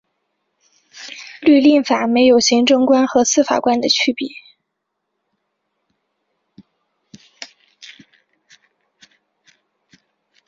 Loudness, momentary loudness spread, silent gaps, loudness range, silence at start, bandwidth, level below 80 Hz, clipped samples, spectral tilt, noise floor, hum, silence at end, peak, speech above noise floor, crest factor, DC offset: -14 LUFS; 24 LU; none; 10 LU; 0.95 s; 7.6 kHz; -62 dBFS; under 0.1%; -2.5 dB/octave; -76 dBFS; none; 2.6 s; -2 dBFS; 62 dB; 16 dB; under 0.1%